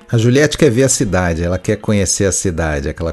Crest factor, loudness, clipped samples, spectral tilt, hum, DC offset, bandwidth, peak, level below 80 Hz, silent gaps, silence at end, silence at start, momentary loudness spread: 14 dB; -14 LUFS; under 0.1%; -4.5 dB/octave; none; under 0.1%; 12.5 kHz; 0 dBFS; -32 dBFS; none; 0 s; 0.1 s; 7 LU